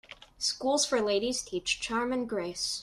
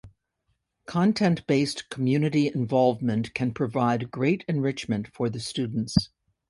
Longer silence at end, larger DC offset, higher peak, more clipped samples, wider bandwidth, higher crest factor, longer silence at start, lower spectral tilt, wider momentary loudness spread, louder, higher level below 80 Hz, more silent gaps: second, 0 s vs 0.45 s; neither; second, -14 dBFS vs -4 dBFS; neither; first, 13.5 kHz vs 11.5 kHz; about the same, 16 dB vs 20 dB; about the same, 0.1 s vs 0.05 s; second, -2 dB/octave vs -6.5 dB/octave; about the same, 6 LU vs 7 LU; second, -30 LUFS vs -26 LUFS; second, -60 dBFS vs -52 dBFS; neither